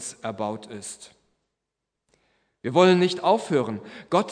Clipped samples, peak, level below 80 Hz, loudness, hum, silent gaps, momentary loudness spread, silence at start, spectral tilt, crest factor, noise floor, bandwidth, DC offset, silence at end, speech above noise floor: under 0.1%; -4 dBFS; -74 dBFS; -23 LUFS; none; none; 18 LU; 0 s; -5.5 dB/octave; 20 dB; -84 dBFS; 10.5 kHz; under 0.1%; 0 s; 60 dB